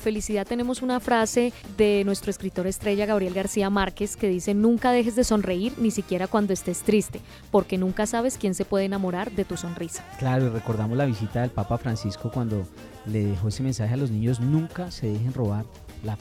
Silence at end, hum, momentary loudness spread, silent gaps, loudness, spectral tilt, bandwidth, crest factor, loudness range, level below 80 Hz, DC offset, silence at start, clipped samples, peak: 0 s; none; 9 LU; none; -25 LUFS; -6 dB/octave; 16 kHz; 16 dB; 4 LU; -46 dBFS; under 0.1%; 0 s; under 0.1%; -8 dBFS